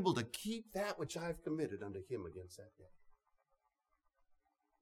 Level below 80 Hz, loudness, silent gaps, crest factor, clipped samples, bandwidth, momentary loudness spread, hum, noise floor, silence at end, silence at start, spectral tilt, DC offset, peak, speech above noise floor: -70 dBFS; -43 LUFS; none; 22 dB; under 0.1%; 19 kHz; 14 LU; none; -84 dBFS; 1.7 s; 0 s; -5 dB/octave; under 0.1%; -22 dBFS; 41 dB